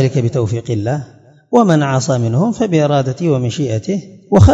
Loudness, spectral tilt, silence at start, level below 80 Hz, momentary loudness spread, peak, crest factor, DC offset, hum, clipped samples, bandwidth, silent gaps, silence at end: -15 LUFS; -7 dB/octave; 0 s; -34 dBFS; 8 LU; 0 dBFS; 14 dB; under 0.1%; none; 0.4%; 8 kHz; none; 0 s